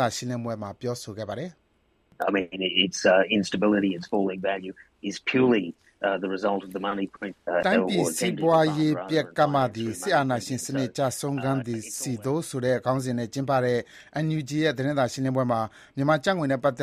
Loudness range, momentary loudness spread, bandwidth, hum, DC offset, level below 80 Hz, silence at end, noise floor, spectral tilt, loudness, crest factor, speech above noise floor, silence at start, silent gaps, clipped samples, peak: 3 LU; 11 LU; 15 kHz; none; under 0.1%; -64 dBFS; 0 s; -67 dBFS; -5 dB/octave; -26 LUFS; 18 dB; 41 dB; 0 s; none; under 0.1%; -8 dBFS